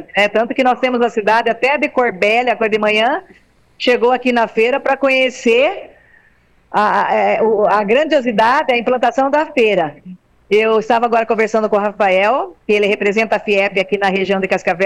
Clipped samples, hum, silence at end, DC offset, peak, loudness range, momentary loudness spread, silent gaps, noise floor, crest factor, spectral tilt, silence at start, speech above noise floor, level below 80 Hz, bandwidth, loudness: under 0.1%; none; 0 s; under 0.1%; -4 dBFS; 1 LU; 4 LU; none; -53 dBFS; 12 dB; -5 dB/octave; 0 s; 38 dB; -54 dBFS; 11 kHz; -14 LUFS